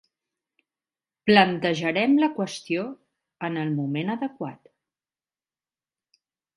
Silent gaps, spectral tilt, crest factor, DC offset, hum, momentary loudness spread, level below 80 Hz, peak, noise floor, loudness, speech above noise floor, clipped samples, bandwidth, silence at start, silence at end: none; -6 dB/octave; 26 dB; under 0.1%; none; 15 LU; -70 dBFS; -2 dBFS; under -90 dBFS; -24 LUFS; over 67 dB; under 0.1%; 11.5 kHz; 1.25 s; 2 s